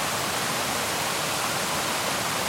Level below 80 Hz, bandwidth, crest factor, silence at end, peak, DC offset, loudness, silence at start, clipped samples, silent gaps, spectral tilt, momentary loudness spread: -58 dBFS; 16.5 kHz; 12 dB; 0 s; -14 dBFS; under 0.1%; -25 LUFS; 0 s; under 0.1%; none; -1.5 dB/octave; 0 LU